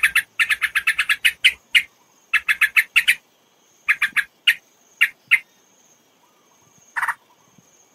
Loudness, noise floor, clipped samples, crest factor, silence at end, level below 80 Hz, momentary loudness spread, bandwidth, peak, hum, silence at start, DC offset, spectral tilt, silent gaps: -18 LUFS; -59 dBFS; under 0.1%; 22 dB; 0.8 s; -64 dBFS; 11 LU; 16 kHz; -2 dBFS; none; 0 s; under 0.1%; 3 dB/octave; none